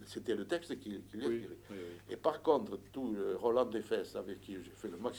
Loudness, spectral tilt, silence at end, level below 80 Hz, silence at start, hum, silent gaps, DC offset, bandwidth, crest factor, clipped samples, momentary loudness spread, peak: -38 LUFS; -5.5 dB/octave; 0 s; -68 dBFS; 0 s; 50 Hz at -70 dBFS; none; under 0.1%; over 20 kHz; 22 dB; under 0.1%; 14 LU; -16 dBFS